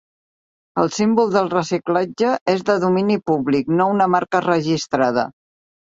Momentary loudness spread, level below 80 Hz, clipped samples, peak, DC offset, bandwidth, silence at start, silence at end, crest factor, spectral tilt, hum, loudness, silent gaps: 5 LU; -60 dBFS; under 0.1%; -2 dBFS; under 0.1%; 7.8 kHz; 0.75 s; 0.6 s; 16 dB; -6 dB/octave; none; -19 LUFS; 2.41-2.46 s